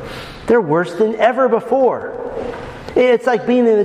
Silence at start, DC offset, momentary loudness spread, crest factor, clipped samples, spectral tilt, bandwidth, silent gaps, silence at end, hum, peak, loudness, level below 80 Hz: 0 s; under 0.1%; 13 LU; 14 dB; under 0.1%; -6.5 dB/octave; 10.5 kHz; none; 0 s; none; 0 dBFS; -16 LUFS; -46 dBFS